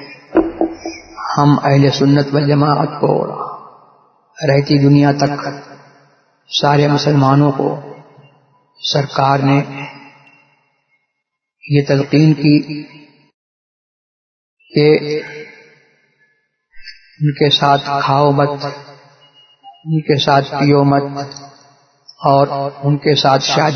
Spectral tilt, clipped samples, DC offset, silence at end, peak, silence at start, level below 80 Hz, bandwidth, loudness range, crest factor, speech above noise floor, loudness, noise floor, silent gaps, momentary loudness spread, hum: -6.5 dB/octave; under 0.1%; under 0.1%; 0 s; 0 dBFS; 0 s; -52 dBFS; 6.6 kHz; 5 LU; 16 dB; 62 dB; -14 LUFS; -75 dBFS; 13.34-14.57 s; 16 LU; none